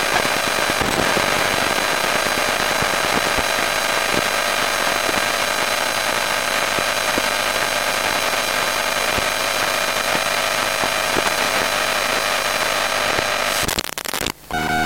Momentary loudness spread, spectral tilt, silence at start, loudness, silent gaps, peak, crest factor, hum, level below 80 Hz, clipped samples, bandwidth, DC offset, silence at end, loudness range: 1 LU; -1.5 dB/octave; 0 s; -18 LUFS; none; -2 dBFS; 18 dB; none; -44 dBFS; under 0.1%; 16.5 kHz; 1%; 0 s; 1 LU